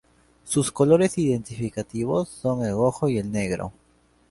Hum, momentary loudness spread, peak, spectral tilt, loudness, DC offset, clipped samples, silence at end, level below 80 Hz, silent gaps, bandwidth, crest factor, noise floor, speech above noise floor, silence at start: none; 11 LU; -6 dBFS; -6 dB/octave; -24 LUFS; under 0.1%; under 0.1%; 0.6 s; -52 dBFS; none; 11.5 kHz; 18 dB; -42 dBFS; 19 dB; 0.45 s